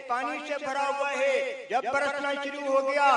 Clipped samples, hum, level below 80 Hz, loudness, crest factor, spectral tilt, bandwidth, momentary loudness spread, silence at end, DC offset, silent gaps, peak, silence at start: under 0.1%; none; -78 dBFS; -28 LUFS; 16 dB; -2 dB/octave; 10.5 kHz; 5 LU; 0 s; under 0.1%; none; -10 dBFS; 0 s